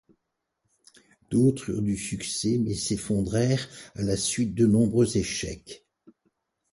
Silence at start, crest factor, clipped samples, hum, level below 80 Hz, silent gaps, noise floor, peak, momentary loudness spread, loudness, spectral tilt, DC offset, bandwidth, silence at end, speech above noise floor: 1.3 s; 16 dB; under 0.1%; none; -50 dBFS; none; -81 dBFS; -10 dBFS; 12 LU; -26 LUFS; -5.5 dB/octave; under 0.1%; 11.5 kHz; 0.95 s; 56 dB